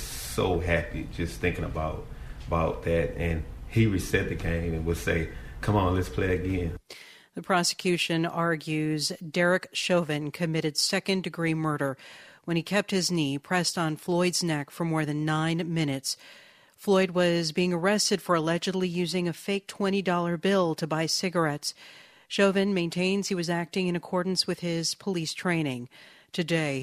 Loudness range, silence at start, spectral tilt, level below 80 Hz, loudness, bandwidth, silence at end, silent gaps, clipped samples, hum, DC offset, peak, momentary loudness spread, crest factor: 2 LU; 0 s; -4.5 dB/octave; -44 dBFS; -27 LUFS; 15.5 kHz; 0 s; none; under 0.1%; none; under 0.1%; -10 dBFS; 9 LU; 18 dB